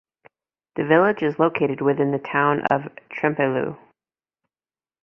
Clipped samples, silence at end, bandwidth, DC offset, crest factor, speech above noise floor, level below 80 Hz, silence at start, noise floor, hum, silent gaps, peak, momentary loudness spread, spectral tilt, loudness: under 0.1%; 1.25 s; 5.8 kHz; under 0.1%; 20 dB; over 69 dB; -64 dBFS; 0.75 s; under -90 dBFS; none; none; -2 dBFS; 11 LU; -9 dB/octave; -21 LUFS